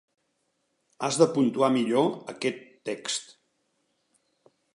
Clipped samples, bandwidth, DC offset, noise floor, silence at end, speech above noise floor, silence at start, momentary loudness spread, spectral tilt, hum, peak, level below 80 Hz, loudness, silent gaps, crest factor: under 0.1%; 11.5 kHz; under 0.1%; -75 dBFS; 1.5 s; 50 dB; 1 s; 11 LU; -4.5 dB/octave; none; -6 dBFS; -80 dBFS; -26 LUFS; none; 22 dB